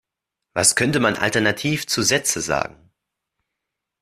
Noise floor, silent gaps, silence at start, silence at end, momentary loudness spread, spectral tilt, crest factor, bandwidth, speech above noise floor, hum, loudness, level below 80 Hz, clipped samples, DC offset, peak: -83 dBFS; none; 0.55 s; 1.3 s; 8 LU; -2.5 dB/octave; 22 dB; 15.5 kHz; 63 dB; none; -19 LUFS; -54 dBFS; under 0.1%; under 0.1%; 0 dBFS